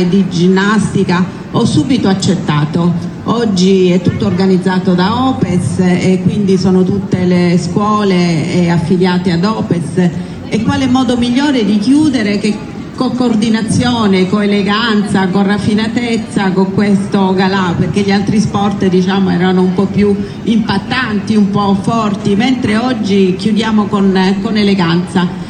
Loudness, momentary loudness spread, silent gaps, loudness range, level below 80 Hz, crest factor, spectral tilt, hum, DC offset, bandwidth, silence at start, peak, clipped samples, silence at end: -12 LUFS; 4 LU; none; 1 LU; -40 dBFS; 12 dB; -6.5 dB/octave; none; under 0.1%; 10.5 kHz; 0 s; 0 dBFS; under 0.1%; 0 s